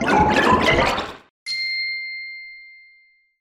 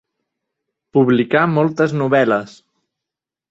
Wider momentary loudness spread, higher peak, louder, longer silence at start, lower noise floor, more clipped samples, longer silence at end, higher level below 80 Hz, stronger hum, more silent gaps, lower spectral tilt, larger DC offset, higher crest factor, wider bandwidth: first, 19 LU vs 4 LU; about the same, -4 dBFS vs -2 dBFS; second, -19 LUFS vs -16 LUFS; second, 0 s vs 0.95 s; second, -56 dBFS vs -86 dBFS; neither; second, 0.7 s vs 1 s; first, -40 dBFS vs -60 dBFS; neither; first, 1.30-1.46 s vs none; second, -4.5 dB/octave vs -7.5 dB/octave; neither; about the same, 18 dB vs 16 dB; first, 16 kHz vs 8 kHz